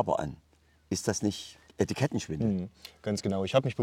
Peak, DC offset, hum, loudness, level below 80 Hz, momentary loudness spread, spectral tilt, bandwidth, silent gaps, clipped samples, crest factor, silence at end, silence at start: -10 dBFS; under 0.1%; none; -31 LUFS; -60 dBFS; 13 LU; -5.5 dB/octave; 16.5 kHz; none; under 0.1%; 20 dB; 0 s; 0 s